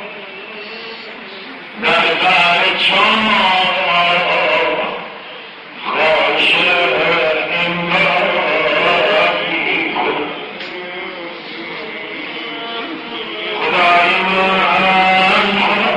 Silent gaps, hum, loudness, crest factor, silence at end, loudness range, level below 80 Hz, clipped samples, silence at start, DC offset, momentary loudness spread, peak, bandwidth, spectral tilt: none; none; -13 LUFS; 16 dB; 0 s; 8 LU; -52 dBFS; under 0.1%; 0 s; under 0.1%; 17 LU; 0 dBFS; 10 kHz; -4 dB/octave